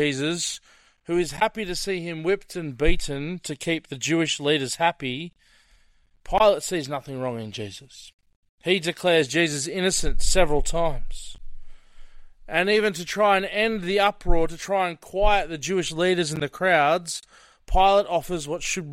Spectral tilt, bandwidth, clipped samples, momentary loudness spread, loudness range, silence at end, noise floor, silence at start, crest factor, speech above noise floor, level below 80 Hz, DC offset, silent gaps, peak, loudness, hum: -3.5 dB/octave; 14.5 kHz; under 0.1%; 12 LU; 4 LU; 0 s; -59 dBFS; 0 s; 18 dB; 36 dB; -32 dBFS; under 0.1%; 8.14-8.19 s, 8.36-8.43 s, 8.49-8.58 s; -6 dBFS; -24 LUFS; none